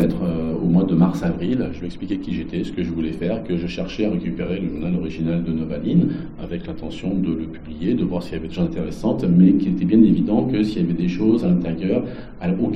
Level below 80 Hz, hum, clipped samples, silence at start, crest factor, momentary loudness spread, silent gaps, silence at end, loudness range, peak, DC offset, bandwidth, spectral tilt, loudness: -38 dBFS; none; under 0.1%; 0 s; 18 dB; 12 LU; none; 0 s; 7 LU; -2 dBFS; under 0.1%; 6.4 kHz; -9 dB/octave; -21 LUFS